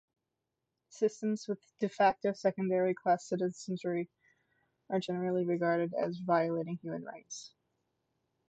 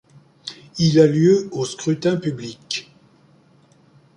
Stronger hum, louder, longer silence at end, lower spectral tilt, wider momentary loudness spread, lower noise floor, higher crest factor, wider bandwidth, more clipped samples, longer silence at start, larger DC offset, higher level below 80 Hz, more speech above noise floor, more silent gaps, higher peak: neither; second, -33 LUFS vs -19 LUFS; second, 1 s vs 1.35 s; about the same, -6 dB/octave vs -6 dB/octave; second, 13 LU vs 20 LU; first, -87 dBFS vs -54 dBFS; about the same, 18 dB vs 18 dB; second, 8.8 kHz vs 10.5 kHz; neither; first, 0.95 s vs 0.45 s; neither; second, -78 dBFS vs -58 dBFS; first, 54 dB vs 36 dB; neither; second, -16 dBFS vs -2 dBFS